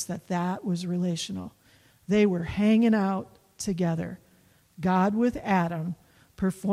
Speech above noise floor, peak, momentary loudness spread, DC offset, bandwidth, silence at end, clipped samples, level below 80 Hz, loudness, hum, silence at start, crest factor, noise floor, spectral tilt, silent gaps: 35 dB; -12 dBFS; 14 LU; under 0.1%; 13.5 kHz; 0 s; under 0.1%; -56 dBFS; -27 LUFS; none; 0 s; 14 dB; -61 dBFS; -6.5 dB/octave; none